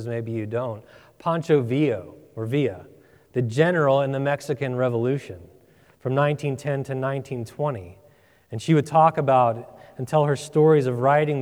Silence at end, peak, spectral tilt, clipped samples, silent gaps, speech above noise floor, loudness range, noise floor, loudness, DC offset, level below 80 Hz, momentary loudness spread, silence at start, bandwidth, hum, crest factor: 0 s; -4 dBFS; -7.5 dB/octave; under 0.1%; none; 34 dB; 5 LU; -56 dBFS; -23 LUFS; under 0.1%; -64 dBFS; 16 LU; 0 s; 13 kHz; none; 18 dB